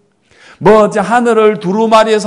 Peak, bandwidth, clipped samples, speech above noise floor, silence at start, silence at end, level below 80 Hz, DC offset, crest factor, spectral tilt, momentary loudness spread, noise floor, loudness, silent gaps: 0 dBFS; 12 kHz; 2%; 36 dB; 0.6 s; 0 s; -46 dBFS; under 0.1%; 10 dB; -5.5 dB/octave; 4 LU; -45 dBFS; -10 LUFS; none